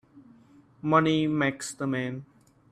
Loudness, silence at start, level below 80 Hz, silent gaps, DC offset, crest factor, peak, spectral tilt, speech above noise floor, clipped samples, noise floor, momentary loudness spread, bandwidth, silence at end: -27 LUFS; 0.15 s; -66 dBFS; none; under 0.1%; 20 dB; -8 dBFS; -5.5 dB/octave; 31 dB; under 0.1%; -57 dBFS; 13 LU; 13.5 kHz; 0.45 s